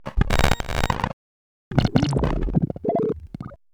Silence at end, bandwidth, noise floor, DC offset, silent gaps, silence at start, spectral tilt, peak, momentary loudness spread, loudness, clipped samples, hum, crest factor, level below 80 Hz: 0.2 s; over 20 kHz; under -90 dBFS; under 0.1%; 1.13-1.71 s; 0 s; -6 dB/octave; 0 dBFS; 11 LU; -24 LUFS; under 0.1%; none; 22 dB; -30 dBFS